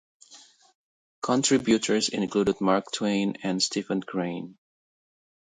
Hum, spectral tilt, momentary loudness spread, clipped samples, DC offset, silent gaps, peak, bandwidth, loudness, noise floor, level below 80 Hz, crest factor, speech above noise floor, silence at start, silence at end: none; -4 dB/octave; 10 LU; under 0.1%; under 0.1%; 0.75-1.22 s; -8 dBFS; 9.6 kHz; -26 LUFS; -54 dBFS; -62 dBFS; 20 dB; 28 dB; 0.3 s; 1.05 s